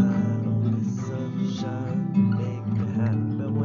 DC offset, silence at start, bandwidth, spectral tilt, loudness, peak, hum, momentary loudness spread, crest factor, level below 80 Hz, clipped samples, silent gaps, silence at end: under 0.1%; 0 s; 7 kHz; -9 dB/octave; -26 LUFS; -10 dBFS; none; 6 LU; 14 dB; -62 dBFS; under 0.1%; none; 0 s